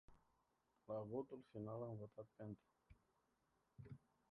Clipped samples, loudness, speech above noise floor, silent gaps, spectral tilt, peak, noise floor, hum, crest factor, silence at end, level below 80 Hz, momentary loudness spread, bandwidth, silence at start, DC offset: under 0.1%; -54 LUFS; 33 dB; none; -10 dB/octave; -34 dBFS; -85 dBFS; none; 20 dB; 0.35 s; -80 dBFS; 13 LU; 4.8 kHz; 0.1 s; under 0.1%